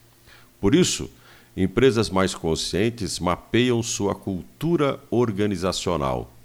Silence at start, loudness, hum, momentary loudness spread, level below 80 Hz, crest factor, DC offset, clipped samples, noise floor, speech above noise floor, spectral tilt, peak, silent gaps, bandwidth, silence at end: 0.6 s; -23 LUFS; none; 9 LU; -44 dBFS; 18 dB; under 0.1%; under 0.1%; -51 dBFS; 29 dB; -5 dB/octave; -6 dBFS; none; 19.5 kHz; 0.05 s